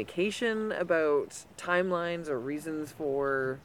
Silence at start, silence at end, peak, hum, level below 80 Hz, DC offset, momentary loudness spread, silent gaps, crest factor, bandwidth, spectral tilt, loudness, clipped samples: 0 s; 0.05 s; -12 dBFS; none; -66 dBFS; under 0.1%; 8 LU; none; 18 dB; 16.5 kHz; -5 dB/octave; -31 LUFS; under 0.1%